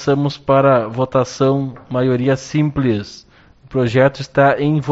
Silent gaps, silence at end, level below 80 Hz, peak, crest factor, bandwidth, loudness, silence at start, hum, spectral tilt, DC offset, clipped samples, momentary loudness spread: none; 0 s; -46 dBFS; 0 dBFS; 16 dB; 8 kHz; -16 LUFS; 0 s; none; -6.5 dB/octave; under 0.1%; under 0.1%; 7 LU